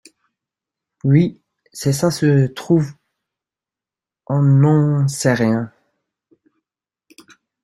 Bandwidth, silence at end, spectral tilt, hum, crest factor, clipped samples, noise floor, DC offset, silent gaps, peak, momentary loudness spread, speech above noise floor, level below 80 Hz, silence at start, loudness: 13 kHz; 1.95 s; -7 dB/octave; none; 16 dB; under 0.1%; -89 dBFS; under 0.1%; none; -2 dBFS; 11 LU; 73 dB; -56 dBFS; 1.05 s; -17 LUFS